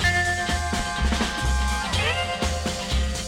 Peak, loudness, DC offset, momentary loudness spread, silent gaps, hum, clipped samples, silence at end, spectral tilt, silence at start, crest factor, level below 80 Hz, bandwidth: -8 dBFS; -24 LUFS; under 0.1%; 3 LU; none; none; under 0.1%; 0 s; -3.5 dB/octave; 0 s; 16 dB; -28 dBFS; 16 kHz